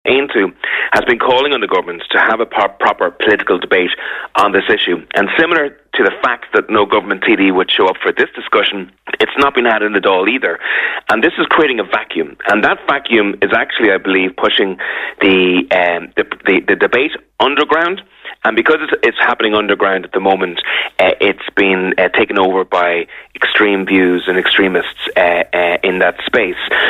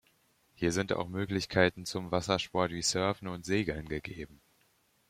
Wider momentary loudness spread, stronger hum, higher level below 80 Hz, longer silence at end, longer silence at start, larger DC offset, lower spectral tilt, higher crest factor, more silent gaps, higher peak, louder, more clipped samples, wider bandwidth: second, 5 LU vs 11 LU; neither; first, -50 dBFS vs -58 dBFS; second, 0 s vs 0.75 s; second, 0.05 s vs 0.6 s; neither; first, -5.5 dB/octave vs -4 dB/octave; second, 14 dB vs 24 dB; neither; first, 0 dBFS vs -10 dBFS; first, -13 LUFS vs -32 LUFS; neither; second, 12.5 kHz vs 16 kHz